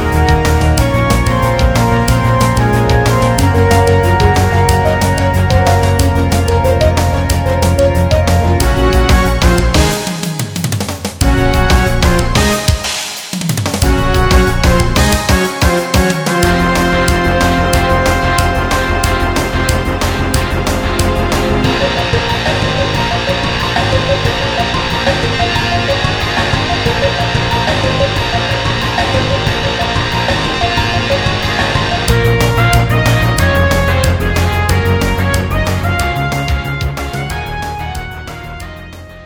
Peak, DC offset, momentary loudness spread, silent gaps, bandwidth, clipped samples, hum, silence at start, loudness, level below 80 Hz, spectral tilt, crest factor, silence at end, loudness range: 0 dBFS; under 0.1%; 6 LU; none; over 20 kHz; under 0.1%; none; 0 s; -12 LUFS; -20 dBFS; -5 dB/octave; 12 dB; 0 s; 3 LU